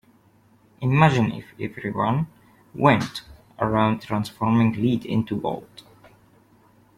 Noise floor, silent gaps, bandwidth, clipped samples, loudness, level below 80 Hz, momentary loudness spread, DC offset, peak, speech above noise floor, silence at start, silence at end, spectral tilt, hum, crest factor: -57 dBFS; none; 14.5 kHz; under 0.1%; -23 LUFS; -54 dBFS; 14 LU; under 0.1%; -4 dBFS; 36 dB; 0.8 s; 1.35 s; -7.5 dB/octave; none; 20 dB